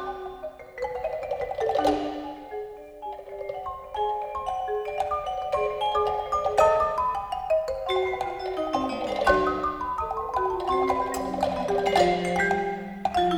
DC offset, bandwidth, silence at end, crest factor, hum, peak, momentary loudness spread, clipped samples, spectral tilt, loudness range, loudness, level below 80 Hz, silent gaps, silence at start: under 0.1%; over 20 kHz; 0 s; 18 dB; none; -8 dBFS; 14 LU; under 0.1%; -5 dB/octave; 5 LU; -27 LUFS; -48 dBFS; none; 0 s